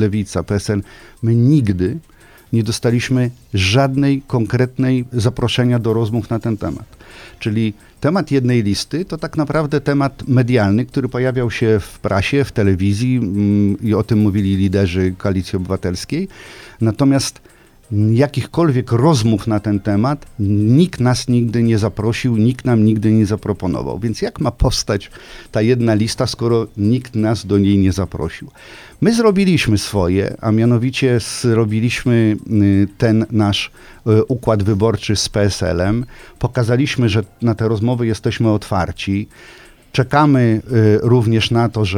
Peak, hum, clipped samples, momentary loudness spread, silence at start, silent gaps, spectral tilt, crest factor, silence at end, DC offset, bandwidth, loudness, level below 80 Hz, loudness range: 0 dBFS; none; under 0.1%; 8 LU; 0 s; none; -6.5 dB/octave; 16 dB; 0 s; under 0.1%; 14 kHz; -16 LUFS; -38 dBFS; 3 LU